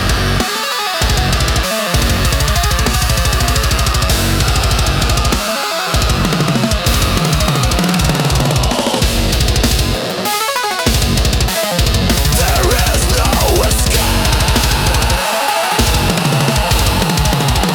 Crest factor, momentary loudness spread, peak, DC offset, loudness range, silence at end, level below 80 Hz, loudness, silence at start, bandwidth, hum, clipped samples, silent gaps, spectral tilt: 10 dB; 3 LU; -2 dBFS; under 0.1%; 1 LU; 0 s; -18 dBFS; -13 LUFS; 0 s; over 20 kHz; none; under 0.1%; none; -4 dB/octave